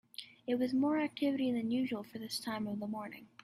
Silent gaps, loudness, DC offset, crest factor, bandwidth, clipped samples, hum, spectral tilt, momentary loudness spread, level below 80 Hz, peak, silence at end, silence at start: none; -36 LUFS; under 0.1%; 14 dB; 14.5 kHz; under 0.1%; none; -5 dB/octave; 12 LU; -76 dBFS; -22 dBFS; 0.2 s; 0.2 s